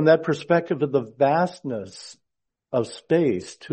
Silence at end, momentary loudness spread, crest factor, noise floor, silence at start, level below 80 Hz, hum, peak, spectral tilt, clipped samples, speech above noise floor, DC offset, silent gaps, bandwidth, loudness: 0 s; 12 LU; 18 dB; -82 dBFS; 0 s; -66 dBFS; none; -4 dBFS; -6.5 dB/octave; under 0.1%; 59 dB; under 0.1%; none; 8.8 kHz; -23 LUFS